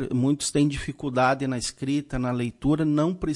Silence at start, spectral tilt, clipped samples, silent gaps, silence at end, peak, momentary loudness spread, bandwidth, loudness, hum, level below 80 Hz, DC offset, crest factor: 0 s; -5.5 dB/octave; under 0.1%; none; 0 s; -10 dBFS; 6 LU; 11.5 kHz; -25 LUFS; none; -44 dBFS; under 0.1%; 14 dB